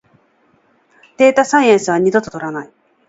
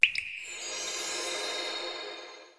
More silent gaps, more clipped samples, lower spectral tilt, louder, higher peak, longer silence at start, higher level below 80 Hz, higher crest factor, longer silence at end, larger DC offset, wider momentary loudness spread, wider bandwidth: neither; neither; first, -4.5 dB/octave vs 1.5 dB/octave; first, -14 LUFS vs -32 LUFS; first, 0 dBFS vs -6 dBFS; first, 1.2 s vs 0 s; first, -60 dBFS vs -72 dBFS; second, 16 dB vs 28 dB; first, 0.45 s vs 0.05 s; neither; first, 14 LU vs 7 LU; second, 8 kHz vs 11 kHz